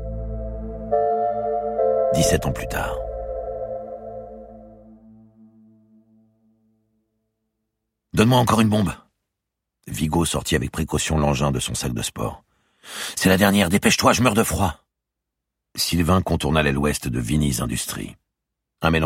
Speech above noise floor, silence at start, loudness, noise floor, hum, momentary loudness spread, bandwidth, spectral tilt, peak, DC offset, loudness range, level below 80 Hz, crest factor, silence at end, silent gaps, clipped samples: 62 dB; 0 s; -21 LUFS; -82 dBFS; none; 16 LU; 16.5 kHz; -4.5 dB/octave; -2 dBFS; under 0.1%; 12 LU; -38 dBFS; 20 dB; 0 s; none; under 0.1%